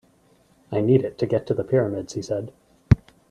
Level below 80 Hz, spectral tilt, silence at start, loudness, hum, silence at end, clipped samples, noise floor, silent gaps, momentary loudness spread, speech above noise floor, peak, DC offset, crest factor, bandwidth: -42 dBFS; -8 dB/octave; 0.7 s; -23 LUFS; none; 0.35 s; under 0.1%; -59 dBFS; none; 10 LU; 36 dB; 0 dBFS; under 0.1%; 24 dB; 9.8 kHz